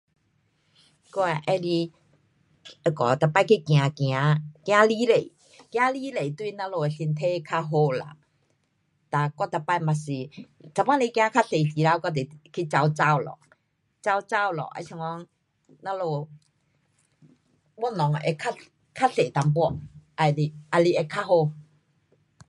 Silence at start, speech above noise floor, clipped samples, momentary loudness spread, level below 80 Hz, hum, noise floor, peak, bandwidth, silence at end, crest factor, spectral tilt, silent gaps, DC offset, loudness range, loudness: 1.15 s; 47 dB; under 0.1%; 13 LU; -64 dBFS; none; -71 dBFS; -4 dBFS; 11 kHz; 0.85 s; 22 dB; -6.5 dB/octave; none; under 0.1%; 8 LU; -25 LUFS